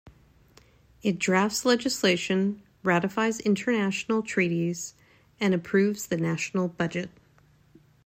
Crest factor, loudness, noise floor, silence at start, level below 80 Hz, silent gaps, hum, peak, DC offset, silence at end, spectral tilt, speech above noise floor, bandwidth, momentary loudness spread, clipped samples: 18 dB; -26 LUFS; -60 dBFS; 0.05 s; -64 dBFS; none; none; -8 dBFS; under 0.1%; 1 s; -5 dB/octave; 34 dB; 16 kHz; 7 LU; under 0.1%